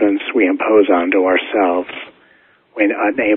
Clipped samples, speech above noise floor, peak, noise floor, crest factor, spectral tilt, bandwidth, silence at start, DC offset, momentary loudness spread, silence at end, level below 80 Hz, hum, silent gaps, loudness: under 0.1%; 38 dB; 0 dBFS; -52 dBFS; 16 dB; -2 dB/octave; 3.9 kHz; 0 s; under 0.1%; 13 LU; 0 s; -56 dBFS; none; none; -15 LUFS